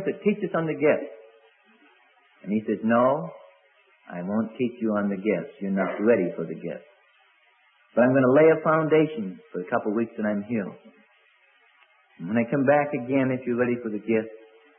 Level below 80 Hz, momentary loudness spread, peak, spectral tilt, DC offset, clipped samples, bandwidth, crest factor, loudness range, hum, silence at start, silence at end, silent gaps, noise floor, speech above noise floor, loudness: -72 dBFS; 15 LU; -8 dBFS; -11.5 dB/octave; under 0.1%; under 0.1%; 3.6 kHz; 18 dB; 6 LU; none; 0 s; 0.4 s; none; -62 dBFS; 38 dB; -24 LUFS